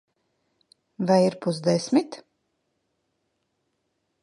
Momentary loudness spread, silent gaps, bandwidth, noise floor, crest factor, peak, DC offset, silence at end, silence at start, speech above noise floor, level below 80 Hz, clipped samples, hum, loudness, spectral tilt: 15 LU; none; 11.5 kHz; -76 dBFS; 22 dB; -6 dBFS; under 0.1%; 2.05 s; 1 s; 53 dB; -76 dBFS; under 0.1%; none; -23 LUFS; -6 dB/octave